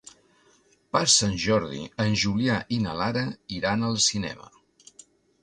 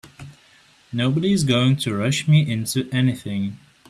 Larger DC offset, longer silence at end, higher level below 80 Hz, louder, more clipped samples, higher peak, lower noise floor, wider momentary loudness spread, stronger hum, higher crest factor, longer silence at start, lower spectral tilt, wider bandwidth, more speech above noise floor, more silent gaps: neither; first, 1 s vs 0.35 s; about the same, -52 dBFS vs -56 dBFS; second, -24 LUFS vs -21 LUFS; neither; about the same, -6 dBFS vs -6 dBFS; first, -62 dBFS vs -54 dBFS; first, 13 LU vs 10 LU; neither; first, 22 dB vs 16 dB; first, 0.95 s vs 0.05 s; second, -3.5 dB/octave vs -5.5 dB/octave; second, 11 kHz vs 13.5 kHz; about the same, 37 dB vs 34 dB; neither